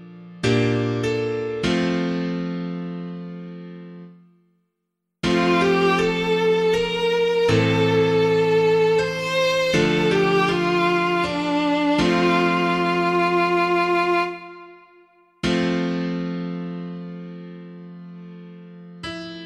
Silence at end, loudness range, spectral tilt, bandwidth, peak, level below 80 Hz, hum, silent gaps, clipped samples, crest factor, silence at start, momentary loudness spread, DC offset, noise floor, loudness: 0 s; 9 LU; -6 dB/octave; 13.5 kHz; -4 dBFS; -50 dBFS; none; none; under 0.1%; 16 dB; 0 s; 20 LU; under 0.1%; -78 dBFS; -20 LUFS